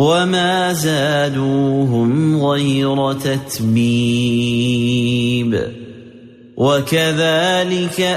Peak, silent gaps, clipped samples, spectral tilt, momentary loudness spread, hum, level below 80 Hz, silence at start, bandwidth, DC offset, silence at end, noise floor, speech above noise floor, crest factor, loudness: -4 dBFS; none; under 0.1%; -5.5 dB/octave; 5 LU; none; -50 dBFS; 0 s; 15 kHz; under 0.1%; 0 s; -40 dBFS; 25 dB; 12 dB; -16 LUFS